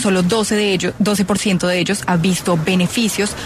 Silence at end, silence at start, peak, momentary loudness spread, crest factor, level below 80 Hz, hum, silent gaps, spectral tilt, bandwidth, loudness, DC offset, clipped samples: 0 s; 0 s; -4 dBFS; 2 LU; 12 dB; -44 dBFS; none; none; -4.5 dB/octave; 14 kHz; -16 LUFS; under 0.1%; under 0.1%